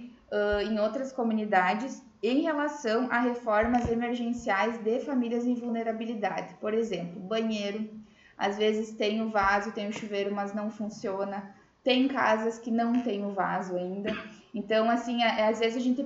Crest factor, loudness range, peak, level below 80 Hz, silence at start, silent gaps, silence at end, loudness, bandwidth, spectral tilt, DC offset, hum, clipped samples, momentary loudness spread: 20 dB; 3 LU; -10 dBFS; -56 dBFS; 0 s; none; 0 s; -29 LUFS; 7.8 kHz; -5 dB/octave; under 0.1%; none; under 0.1%; 9 LU